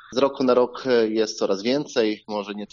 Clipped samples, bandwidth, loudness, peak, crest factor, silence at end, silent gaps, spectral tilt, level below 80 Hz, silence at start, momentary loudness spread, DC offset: under 0.1%; 7.4 kHz; -22 LUFS; -6 dBFS; 16 dB; 0.05 s; none; -3.5 dB/octave; -66 dBFS; 0.1 s; 8 LU; under 0.1%